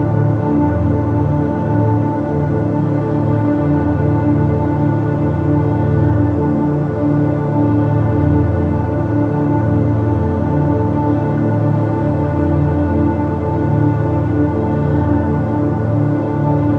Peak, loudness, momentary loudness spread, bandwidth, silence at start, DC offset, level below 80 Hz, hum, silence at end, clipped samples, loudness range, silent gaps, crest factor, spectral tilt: 0 dBFS; -16 LUFS; 2 LU; 4.3 kHz; 0 s; under 0.1%; -38 dBFS; none; 0 s; under 0.1%; 1 LU; none; 14 dB; -11 dB/octave